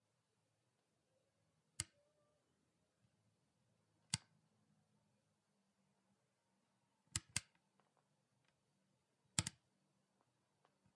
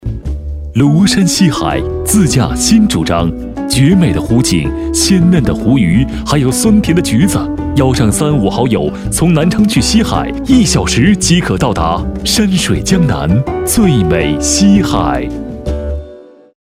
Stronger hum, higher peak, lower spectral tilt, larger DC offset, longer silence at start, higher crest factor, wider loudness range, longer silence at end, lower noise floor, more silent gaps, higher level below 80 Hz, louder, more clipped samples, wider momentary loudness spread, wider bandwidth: neither; second, -18 dBFS vs 0 dBFS; second, -1.5 dB/octave vs -5 dB/octave; neither; first, 1.8 s vs 0 s; first, 38 dB vs 10 dB; first, 9 LU vs 1 LU; first, 1.45 s vs 0.45 s; first, -86 dBFS vs -35 dBFS; neither; second, -78 dBFS vs -24 dBFS; second, -46 LUFS vs -11 LUFS; second, under 0.1% vs 0.2%; about the same, 7 LU vs 7 LU; second, 10 kHz vs 16 kHz